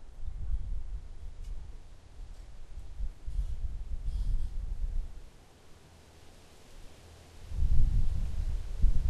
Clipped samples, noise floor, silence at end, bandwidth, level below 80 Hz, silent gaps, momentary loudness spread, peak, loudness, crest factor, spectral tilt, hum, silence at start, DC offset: under 0.1%; -55 dBFS; 0 s; 5.8 kHz; -32 dBFS; none; 23 LU; -12 dBFS; -38 LUFS; 20 dB; -7 dB/octave; none; 0 s; under 0.1%